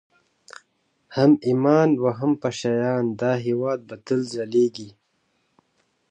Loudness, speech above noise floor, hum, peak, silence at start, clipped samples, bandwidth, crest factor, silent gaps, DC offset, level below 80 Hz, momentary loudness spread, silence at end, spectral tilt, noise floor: -22 LUFS; 49 dB; none; -4 dBFS; 1.1 s; under 0.1%; 9.4 kHz; 18 dB; none; under 0.1%; -68 dBFS; 10 LU; 1.2 s; -7 dB/octave; -70 dBFS